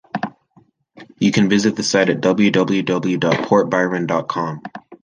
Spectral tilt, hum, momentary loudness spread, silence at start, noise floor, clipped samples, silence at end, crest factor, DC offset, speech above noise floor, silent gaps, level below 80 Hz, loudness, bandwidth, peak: -5 dB/octave; none; 12 LU; 0.15 s; -55 dBFS; under 0.1%; 0.1 s; 16 dB; under 0.1%; 38 dB; none; -58 dBFS; -17 LUFS; 9.8 kHz; -2 dBFS